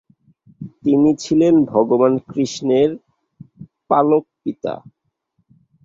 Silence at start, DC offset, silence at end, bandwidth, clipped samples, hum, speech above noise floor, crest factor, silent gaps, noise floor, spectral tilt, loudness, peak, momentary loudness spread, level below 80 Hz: 0.6 s; under 0.1%; 1.05 s; 7.8 kHz; under 0.1%; none; 52 dB; 18 dB; none; -68 dBFS; -7 dB/octave; -17 LUFS; 0 dBFS; 16 LU; -58 dBFS